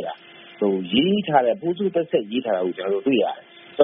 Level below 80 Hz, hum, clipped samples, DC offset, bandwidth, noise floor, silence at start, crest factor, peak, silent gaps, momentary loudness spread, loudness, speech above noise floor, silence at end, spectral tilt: -64 dBFS; none; under 0.1%; under 0.1%; 3.9 kHz; -41 dBFS; 0 s; 20 dB; -2 dBFS; none; 12 LU; -22 LUFS; 20 dB; 0 s; -4 dB/octave